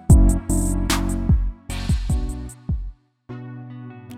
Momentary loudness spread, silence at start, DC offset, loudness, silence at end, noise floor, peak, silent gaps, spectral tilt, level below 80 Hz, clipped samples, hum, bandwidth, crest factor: 18 LU; 0.1 s; under 0.1%; -22 LUFS; 0 s; -39 dBFS; -4 dBFS; none; -5.5 dB/octave; -22 dBFS; under 0.1%; none; 15.5 kHz; 16 dB